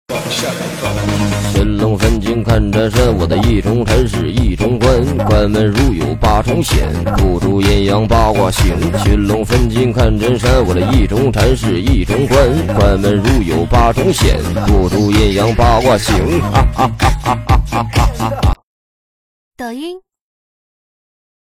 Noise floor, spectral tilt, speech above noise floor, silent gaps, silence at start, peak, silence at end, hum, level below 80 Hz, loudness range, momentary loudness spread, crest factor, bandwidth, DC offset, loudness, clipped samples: under -90 dBFS; -6 dB/octave; over 78 dB; 18.63-19.52 s; 0.1 s; 0 dBFS; 1.5 s; none; -18 dBFS; 4 LU; 5 LU; 12 dB; 16 kHz; under 0.1%; -13 LUFS; under 0.1%